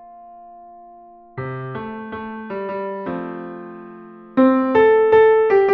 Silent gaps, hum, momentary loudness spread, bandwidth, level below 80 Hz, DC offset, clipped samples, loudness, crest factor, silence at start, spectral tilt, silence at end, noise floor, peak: none; none; 22 LU; 4.8 kHz; -58 dBFS; under 0.1%; under 0.1%; -17 LUFS; 16 dB; 0 s; -5.5 dB/octave; 0 s; -44 dBFS; -4 dBFS